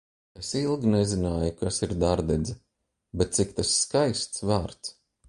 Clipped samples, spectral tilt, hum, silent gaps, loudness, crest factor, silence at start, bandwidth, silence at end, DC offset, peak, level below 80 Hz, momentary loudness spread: under 0.1%; -4.5 dB/octave; none; none; -26 LUFS; 20 dB; 0.35 s; 11.5 kHz; 0.4 s; under 0.1%; -8 dBFS; -42 dBFS; 13 LU